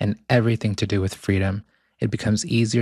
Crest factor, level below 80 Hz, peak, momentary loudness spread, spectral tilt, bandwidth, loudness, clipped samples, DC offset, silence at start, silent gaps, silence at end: 18 dB; -54 dBFS; -4 dBFS; 7 LU; -6 dB/octave; 12.5 kHz; -23 LUFS; under 0.1%; under 0.1%; 0 s; none; 0 s